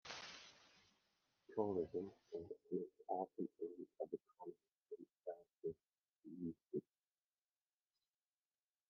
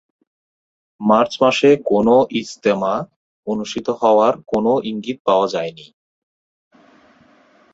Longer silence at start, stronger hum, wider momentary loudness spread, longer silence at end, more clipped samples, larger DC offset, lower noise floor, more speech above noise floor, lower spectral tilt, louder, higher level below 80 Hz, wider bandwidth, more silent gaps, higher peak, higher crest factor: second, 0.05 s vs 1 s; neither; first, 15 LU vs 11 LU; first, 2.1 s vs 1.9 s; neither; neither; first, under -90 dBFS vs -53 dBFS; first, over 42 dB vs 36 dB; about the same, -5 dB/octave vs -5.5 dB/octave; second, -49 LUFS vs -17 LUFS; second, -88 dBFS vs -58 dBFS; second, 6.8 kHz vs 8 kHz; second, 4.82-4.86 s, 6.00-6.22 s vs 3.16-3.43 s, 5.20-5.25 s; second, -26 dBFS vs -2 dBFS; first, 24 dB vs 18 dB